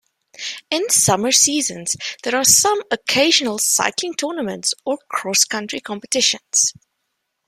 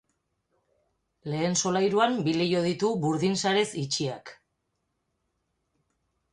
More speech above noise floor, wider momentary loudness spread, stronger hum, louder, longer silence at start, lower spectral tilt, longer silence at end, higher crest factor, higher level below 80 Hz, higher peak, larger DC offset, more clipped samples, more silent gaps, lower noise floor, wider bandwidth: first, 56 dB vs 52 dB; about the same, 11 LU vs 9 LU; neither; first, -17 LUFS vs -26 LUFS; second, 0.4 s vs 1.25 s; second, -1 dB/octave vs -4.5 dB/octave; second, 0.75 s vs 2 s; about the same, 20 dB vs 20 dB; first, -62 dBFS vs -68 dBFS; first, 0 dBFS vs -10 dBFS; neither; neither; neither; second, -74 dBFS vs -78 dBFS; first, 16 kHz vs 11.5 kHz